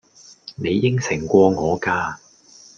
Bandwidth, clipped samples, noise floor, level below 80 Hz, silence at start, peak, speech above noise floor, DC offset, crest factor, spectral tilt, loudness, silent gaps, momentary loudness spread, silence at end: 7.4 kHz; under 0.1%; -48 dBFS; -54 dBFS; 0.45 s; -2 dBFS; 30 dB; under 0.1%; 18 dB; -6 dB/octave; -19 LUFS; none; 22 LU; 0.6 s